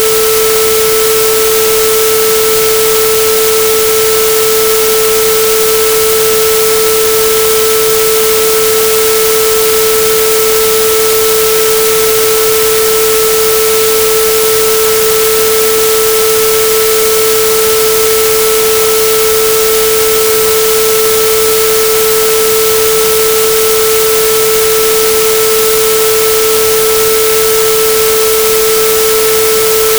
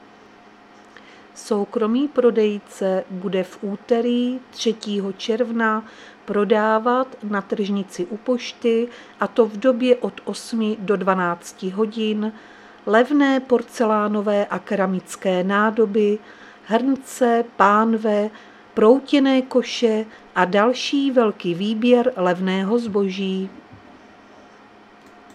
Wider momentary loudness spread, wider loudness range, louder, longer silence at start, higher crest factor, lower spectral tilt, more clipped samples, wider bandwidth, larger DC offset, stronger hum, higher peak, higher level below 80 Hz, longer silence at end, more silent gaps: second, 0 LU vs 9 LU; second, 0 LU vs 4 LU; first, -7 LUFS vs -20 LUFS; second, 0 s vs 1.35 s; second, 8 dB vs 20 dB; second, -0.5 dB/octave vs -5.5 dB/octave; neither; first, over 20 kHz vs 13 kHz; neither; neither; about the same, 0 dBFS vs 0 dBFS; first, -38 dBFS vs -68 dBFS; second, 0 s vs 1.6 s; neither